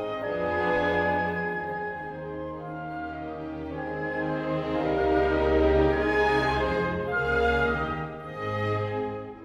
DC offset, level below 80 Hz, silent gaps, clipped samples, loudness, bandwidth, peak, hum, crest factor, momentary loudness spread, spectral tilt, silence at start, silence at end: under 0.1%; -40 dBFS; none; under 0.1%; -27 LUFS; 9 kHz; -12 dBFS; none; 16 dB; 12 LU; -7 dB/octave; 0 s; 0 s